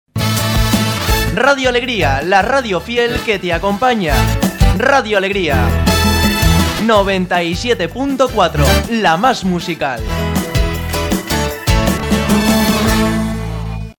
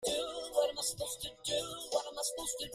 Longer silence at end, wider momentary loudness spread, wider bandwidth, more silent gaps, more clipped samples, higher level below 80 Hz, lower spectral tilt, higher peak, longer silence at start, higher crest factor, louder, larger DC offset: about the same, 0.05 s vs 0 s; about the same, 6 LU vs 5 LU; first, 19 kHz vs 15.5 kHz; neither; neither; first, -22 dBFS vs -64 dBFS; first, -5 dB/octave vs -1.5 dB/octave; first, 0 dBFS vs -18 dBFS; first, 0.15 s vs 0 s; about the same, 14 dB vs 18 dB; first, -14 LUFS vs -36 LUFS; neither